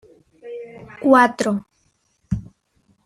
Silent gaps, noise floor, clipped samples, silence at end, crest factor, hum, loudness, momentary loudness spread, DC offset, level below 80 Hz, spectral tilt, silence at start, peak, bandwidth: none; -65 dBFS; under 0.1%; 0.65 s; 20 dB; none; -19 LUFS; 22 LU; under 0.1%; -46 dBFS; -6 dB/octave; 0.45 s; -2 dBFS; 13.5 kHz